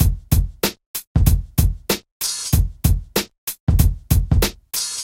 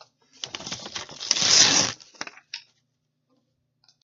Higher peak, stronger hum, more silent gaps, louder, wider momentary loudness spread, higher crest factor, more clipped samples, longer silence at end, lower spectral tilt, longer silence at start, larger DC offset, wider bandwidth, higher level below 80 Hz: about the same, 0 dBFS vs 0 dBFS; neither; first, 0.86-0.94 s, 1.07-1.15 s, 2.11-2.20 s, 3.38-3.47 s, 3.60-3.67 s vs none; about the same, -20 LUFS vs -18 LUFS; second, 6 LU vs 24 LU; second, 18 dB vs 26 dB; neither; second, 0 s vs 1.45 s; first, -4.5 dB/octave vs 0.5 dB/octave; second, 0 s vs 0.45 s; neither; first, 17 kHz vs 11.5 kHz; first, -22 dBFS vs -68 dBFS